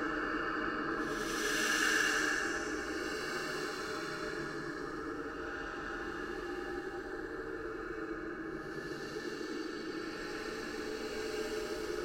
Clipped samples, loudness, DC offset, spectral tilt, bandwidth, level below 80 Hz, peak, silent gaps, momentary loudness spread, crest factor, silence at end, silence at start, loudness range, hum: under 0.1%; -37 LUFS; under 0.1%; -2.5 dB/octave; 16 kHz; -58 dBFS; -18 dBFS; none; 11 LU; 20 dB; 0 s; 0 s; 8 LU; none